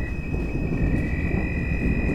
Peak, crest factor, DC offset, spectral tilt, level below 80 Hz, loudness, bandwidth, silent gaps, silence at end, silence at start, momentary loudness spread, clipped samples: -10 dBFS; 14 dB; under 0.1%; -9 dB/octave; -28 dBFS; -26 LUFS; 8.2 kHz; none; 0 s; 0 s; 4 LU; under 0.1%